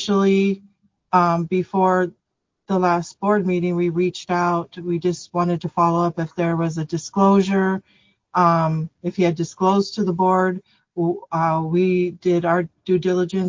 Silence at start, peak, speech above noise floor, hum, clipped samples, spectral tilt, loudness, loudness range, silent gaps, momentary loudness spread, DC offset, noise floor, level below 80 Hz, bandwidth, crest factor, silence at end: 0 s; -4 dBFS; 57 dB; none; under 0.1%; -7 dB/octave; -20 LUFS; 2 LU; none; 8 LU; under 0.1%; -76 dBFS; -60 dBFS; 7.6 kHz; 16 dB; 0 s